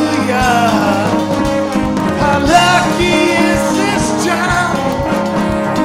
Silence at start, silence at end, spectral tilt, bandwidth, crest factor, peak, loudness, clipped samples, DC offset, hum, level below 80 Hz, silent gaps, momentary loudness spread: 0 s; 0 s; -4.5 dB/octave; 16 kHz; 12 dB; 0 dBFS; -13 LUFS; under 0.1%; under 0.1%; none; -32 dBFS; none; 5 LU